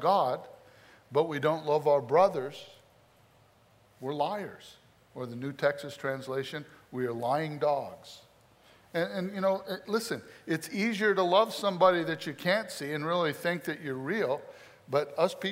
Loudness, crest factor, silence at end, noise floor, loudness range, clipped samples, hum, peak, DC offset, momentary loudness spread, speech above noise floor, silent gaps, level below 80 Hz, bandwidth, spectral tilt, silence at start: -30 LUFS; 20 dB; 0 s; -63 dBFS; 7 LU; under 0.1%; none; -10 dBFS; under 0.1%; 16 LU; 33 dB; none; -76 dBFS; 16 kHz; -5 dB/octave; 0 s